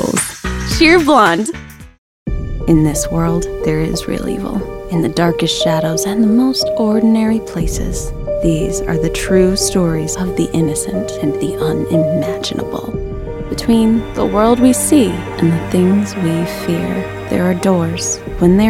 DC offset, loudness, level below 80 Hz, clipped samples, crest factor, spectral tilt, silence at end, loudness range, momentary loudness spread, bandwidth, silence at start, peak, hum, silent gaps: under 0.1%; -15 LUFS; -28 dBFS; under 0.1%; 14 dB; -5 dB/octave; 0 s; 4 LU; 11 LU; 16.5 kHz; 0 s; 0 dBFS; none; 1.98-2.26 s